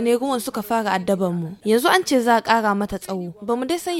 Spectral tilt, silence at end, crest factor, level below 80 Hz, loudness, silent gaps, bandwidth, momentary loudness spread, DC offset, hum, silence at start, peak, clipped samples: -4.5 dB/octave; 0 s; 20 dB; -52 dBFS; -21 LUFS; none; 17 kHz; 9 LU; under 0.1%; none; 0 s; -2 dBFS; under 0.1%